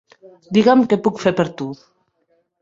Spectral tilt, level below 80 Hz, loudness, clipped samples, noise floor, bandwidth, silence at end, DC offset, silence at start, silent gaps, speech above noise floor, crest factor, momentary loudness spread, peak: -6.5 dB/octave; -58 dBFS; -17 LUFS; under 0.1%; -65 dBFS; 7.8 kHz; 0.9 s; under 0.1%; 0.5 s; none; 48 dB; 18 dB; 16 LU; -2 dBFS